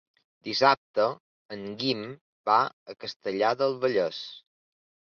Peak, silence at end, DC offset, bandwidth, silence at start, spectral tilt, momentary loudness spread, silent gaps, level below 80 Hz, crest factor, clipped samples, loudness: -8 dBFS; 0.75 s; under 0.1%; 6.8 kHz; 0.45 s; -5 dB/octave; 18 LU; 0.77-0.94 s, 1.20-1.49 s, 2.21-2.44 s, 2.73-2.86 s, 3.16-3.20 s; -74 dBFS; 22 dB; under 0.1%; -27 LUFS